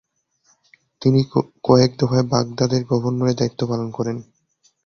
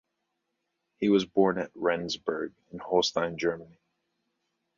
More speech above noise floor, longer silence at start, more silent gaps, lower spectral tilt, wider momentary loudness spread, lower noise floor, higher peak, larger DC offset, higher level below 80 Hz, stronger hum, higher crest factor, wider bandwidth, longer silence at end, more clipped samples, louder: second, 44 dB vs 53 dB; about the same, 1 s vs 1 s; neither; first, -7 dB/octave vs -5 dB/octave; about the same, 9 LU vs 11 LU; second, -63 dBFS vs -81 dBFS; first, -2 dBFS vs -10 dBFS; neither; first, -52 dBFS vs -66 dBFS; neither; about the same, 18 dB vs 20 dB; second, 6.8 kHz vs 7.6 kHz; second, 0.65 s vs 1.15 s; neither; first, -20 LUFS vs -28 LUFS